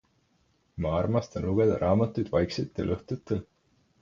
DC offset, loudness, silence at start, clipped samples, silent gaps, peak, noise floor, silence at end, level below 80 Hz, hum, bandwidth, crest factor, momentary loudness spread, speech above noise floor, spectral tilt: under 0.1%; -28 LUFS; 0.75 s; under 0.1%; none; -10 dBFS; -69 dBFS; 0.6 s; -46 dBFS; none; 7.4 kHz; 18 dB; 9 LU; 42 dB; -8 dB/octave